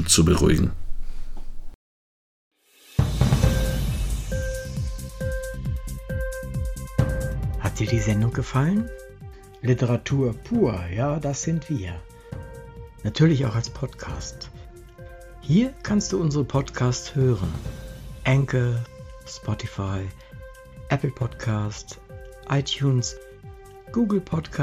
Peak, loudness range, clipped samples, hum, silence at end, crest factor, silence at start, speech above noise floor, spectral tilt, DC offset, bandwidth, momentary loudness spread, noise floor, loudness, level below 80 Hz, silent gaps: -4 dBFS; 5 LU; under 0.1%; none; 0 s; 20 dB; 0 s; over 67 dB; -5.5 dB/octave; under 0.1%; 16 kHz; 21 LU; under -90 dBFS; -25 LUFS; -34 dBFS; 1.75-2.51 s